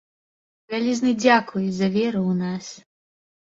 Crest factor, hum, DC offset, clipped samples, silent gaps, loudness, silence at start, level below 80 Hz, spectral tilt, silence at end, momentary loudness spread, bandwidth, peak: 20 dB; none; under 0.1%; under 0.1%; none; -22 LUFS; 0.7 s; -64 dBFS; -5.5 dB/octave; 0.8 s; 12 LU; 7.8 kHz; -4 dBFS